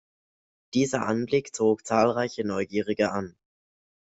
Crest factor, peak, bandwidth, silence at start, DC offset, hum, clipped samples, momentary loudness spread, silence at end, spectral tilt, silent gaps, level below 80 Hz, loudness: 20 dB; -8 dBFS; 8.2 kHz; 0.75 s; under 0.1%; none; under 0.1%; 6 LU; 0.75 s; -5 dB/octave; none; -64 dBFS; -26 LUFS